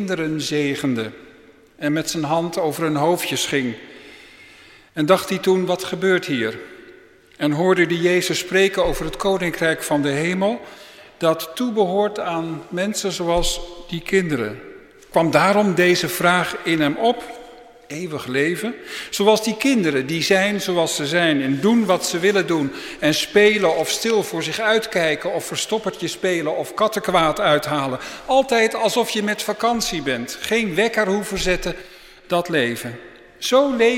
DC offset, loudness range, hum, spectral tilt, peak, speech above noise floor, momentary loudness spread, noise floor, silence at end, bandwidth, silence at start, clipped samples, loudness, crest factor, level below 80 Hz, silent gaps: under 0.1%; 4 LU; none; -4 dB/octave; 0 dBFS; 29 dB; 10 LU; -48 dBFS; 0 s; 16.5 kHz; 0 s; under 0.1%; -20 LUFS; 20 dB; -42 dBFS; none